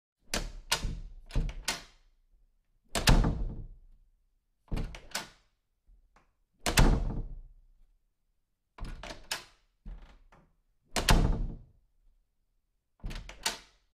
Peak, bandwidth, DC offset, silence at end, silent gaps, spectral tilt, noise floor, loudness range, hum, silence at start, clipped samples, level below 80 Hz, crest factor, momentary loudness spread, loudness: -8 dBFS; 15.5 kHz; under 0.1%; 0.35 s; none; -4 dB/octave; -77 dBFS; 11 LU; none; 0.3 s; under 0.1%; -36 dBFS; 26 dB; 22 LU; -32 LUFS